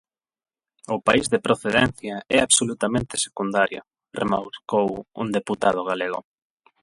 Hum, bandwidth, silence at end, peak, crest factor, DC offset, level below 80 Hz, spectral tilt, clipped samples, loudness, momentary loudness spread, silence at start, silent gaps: none; 11.5 kHz; 0.6 s; -2 dBFS; 22 dB; under 0.1%; -52 dBFS; -3 dB/octave; under 0.1%; -22 LUFS; 11 LU; 0.9 s; none